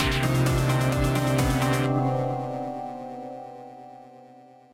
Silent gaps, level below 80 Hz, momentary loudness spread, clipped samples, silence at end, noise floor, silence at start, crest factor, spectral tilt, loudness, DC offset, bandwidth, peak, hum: none; -38 dBFS; 19 LU; under 0.1%; 0.4 s; -50 dBFS; 0 s; 14 dB; -6 dB/octave; -25 LUFS; under 0.1%; 16 kHz; -12 dBFS; none